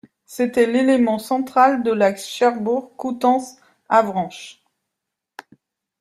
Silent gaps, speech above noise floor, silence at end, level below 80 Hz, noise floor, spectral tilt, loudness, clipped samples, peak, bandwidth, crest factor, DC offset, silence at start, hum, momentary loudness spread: none; 64 dB; 1.5 s; -66 dBFS; -82 dBFS; -5 dB/octave; -19 LUFS; under 0.1%; -2 dBFS; 14.5 kHz; 18 dB; under 0.1%; 0.3 s; none; 14 LU